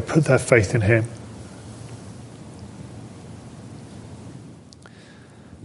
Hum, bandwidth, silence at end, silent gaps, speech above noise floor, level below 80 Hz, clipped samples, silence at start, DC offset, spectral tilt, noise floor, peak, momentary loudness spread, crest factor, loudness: none; 11.5 kHz; 1.15 s; none; 28 dB; -46 dBFS; under 0.1%; 0 s; under 0.1%; -6.5 dB/octave; -45 dBFS; -2 dBFS; 27 LU; 24 dB; -19 LUFS